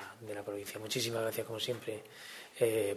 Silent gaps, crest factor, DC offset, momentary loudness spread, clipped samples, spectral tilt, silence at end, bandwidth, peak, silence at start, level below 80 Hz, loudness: none; 20 dB; under 0.1%; 13 LU; under 0.1%; -3.5 dB/octave; 0 s; 14 kHz; -18 dBFS; 0 s; -76 dBFS; -37 LUFS